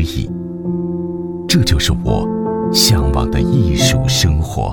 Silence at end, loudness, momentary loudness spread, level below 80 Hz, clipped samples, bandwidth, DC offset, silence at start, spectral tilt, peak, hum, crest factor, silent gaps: 0 s; -15 LUFS; 11 LU; -24 dBFS; under 0.1%; 18 kHz; under 0.1%; 0 s; -4.5 dB/octave; 0 dBFS; none; 14 dB; none